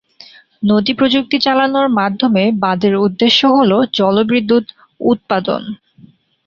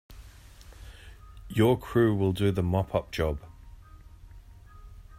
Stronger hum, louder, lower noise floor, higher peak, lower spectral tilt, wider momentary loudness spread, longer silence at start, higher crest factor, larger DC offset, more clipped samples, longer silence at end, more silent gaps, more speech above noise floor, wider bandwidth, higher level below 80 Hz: neither; first, -14 LUFS vs -27 LUFS; about the same, -46 dBFS vs -49 dBFS; first, 0 dBFS vs -10 dBFS; second, -6 dB/octave vs -7.5 dB/octave; second, 9 LU vs 25 LU; first, 0.6 s vs 0.1 s; second, 14 dB vs 20 dB; neither; neither; first, 0.7 s vs 0.15 s; neither; first, 33 dB vs 24 dB; second, 7.2 kHz vs 16 kHz; second, -54 dBFS vs -46 dBFS